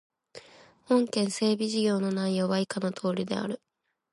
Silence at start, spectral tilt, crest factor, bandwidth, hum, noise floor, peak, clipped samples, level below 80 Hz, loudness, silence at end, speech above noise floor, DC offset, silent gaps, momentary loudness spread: 0.35 s; -5.5 dB/octave; 16 dB; 11.5 kHz; none; -55 dBFS; -14 dBFS; under 0.1%; -74 dBFS; -28 LUFS; 0.55 s; 28 dB; under 0.1%; none; 7 LU